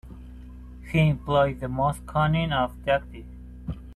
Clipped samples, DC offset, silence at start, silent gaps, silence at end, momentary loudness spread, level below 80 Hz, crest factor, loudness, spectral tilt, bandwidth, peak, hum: under 0.1%; under 0.1%; 0.05 s; none; 0 s; 21 LU; -40 dBFS; 18 dB; -25 LUFS; -7.5 dB/octave; 12.5 kHz; -8 dBFS; none